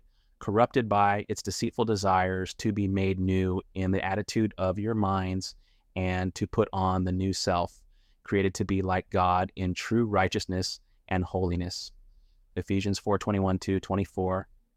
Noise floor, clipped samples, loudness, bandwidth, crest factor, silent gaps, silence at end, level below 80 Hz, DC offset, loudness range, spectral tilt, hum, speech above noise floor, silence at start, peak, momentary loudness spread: -58 dBFS; under 0.1%; -28 LUFS; 14 kHz; 18 dB; none; 0.35 s; -52 dBFS; under 0.1%; 3 LU; -6 dB/octave; none; 31 dB; 0.4 s; -10 dBFS; 8 LU